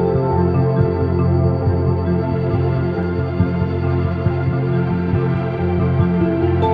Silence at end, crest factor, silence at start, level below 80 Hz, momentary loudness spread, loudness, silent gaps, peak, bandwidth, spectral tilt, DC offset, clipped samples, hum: 0 s; 14 dB; 0 s; -34 dBFS; 3 LU; -18 LUFS; none; -2 dBFS; 4.9 kHz; -11 dB/octave; under 0.1%; under 0.1%; none